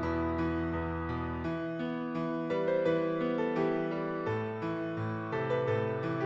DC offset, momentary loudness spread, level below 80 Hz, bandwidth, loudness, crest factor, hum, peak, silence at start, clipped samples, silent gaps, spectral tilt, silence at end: under 0.1%; 5 LU; -52 dBFS; 7.2 kHz; -33 LUFS; 14 dB; none; -18 dBFS; 0 s; under 0.1%; none; -8.5 dB/octave; 0 s